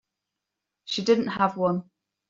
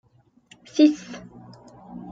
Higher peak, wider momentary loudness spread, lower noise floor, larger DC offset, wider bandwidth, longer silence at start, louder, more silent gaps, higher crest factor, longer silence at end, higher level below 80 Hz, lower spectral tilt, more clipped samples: about the same, -8 dBFS vs -6 dBFS; second, 10 LU vs 24 LU; first, -85 dBFS vs -56 dBFS; neither; about the same, 7.8 kHz vs 7.6 kHz; about the same, 0.85 s vs 0.75 s; second, -25 LUFS vs -21 LUFS; neither; about the same, 20 dB vs 20 dB; first, 0.45 s vs 0 s; about the same, -68 dBFS vs -66 dBFS; about the same, -4 dB/octave vs -5 dB/octave; neither